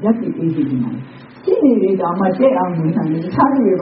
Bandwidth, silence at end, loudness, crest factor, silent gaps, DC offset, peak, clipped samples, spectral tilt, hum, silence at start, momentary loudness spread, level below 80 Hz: 5.6 kHz; 0 s; -16 LUFS; 14 dB; none; under 0.1%; 0 dBFS; under 0.1%; -8.5 dB/octave; none; 0 s; 10 LU; -54 dBFS